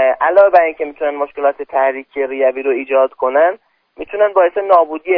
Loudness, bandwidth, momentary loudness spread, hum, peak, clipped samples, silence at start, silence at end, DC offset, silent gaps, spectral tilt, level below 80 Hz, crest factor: -14 LUFS; 5.4 kHz; 10 LU; none; 0 dBFS; under 0.1%; 0 s; 0 s; under 0.1%; none; -6.5 dB/octave; -58 dBFS; 14 dB